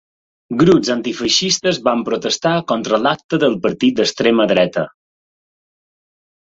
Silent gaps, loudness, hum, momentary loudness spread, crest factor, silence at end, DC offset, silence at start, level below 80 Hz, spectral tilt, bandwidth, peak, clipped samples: 3.24-3.29 s; -16 LUFS; none; 6 LU; 18 dB; 1.6 s; under 0.1%; 0.5 s; -54 dBFS; -4 dB/octave; 8 kHz; 0 dBFS; under 0.1%